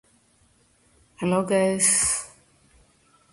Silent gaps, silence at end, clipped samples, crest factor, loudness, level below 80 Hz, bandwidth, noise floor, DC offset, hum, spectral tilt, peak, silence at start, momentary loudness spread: none; 1.05 s; under 0.1%; 20 dB; -21 LUFS; -56 dBFS; 11.5 kHz; -62 dBFS; under 0.1%; none; -3.5 dB/octave; -8 dBFS; 1.2 s; 12 LU